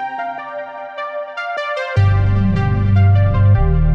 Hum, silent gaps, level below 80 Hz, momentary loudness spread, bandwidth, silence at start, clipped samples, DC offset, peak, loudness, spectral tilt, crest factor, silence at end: none; none; -24 dBFS; 14 LU; 5.6 kHz; 0 s; under 0.1%; under 0.1%; -4 dBFS; -16 LUFS; -9 dB/octave; 10 dB; 0 s